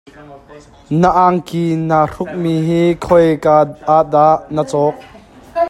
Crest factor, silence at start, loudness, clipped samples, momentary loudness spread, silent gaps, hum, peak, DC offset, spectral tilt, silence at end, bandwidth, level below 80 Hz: 14 dB; 0.2 s; -14 LUFS; under 0.1%; 7 LU; none; none; 0 dBFS; under 0.1%; -7.5 dB/octave; 0 s; 12.5 kHz; -44 dBFS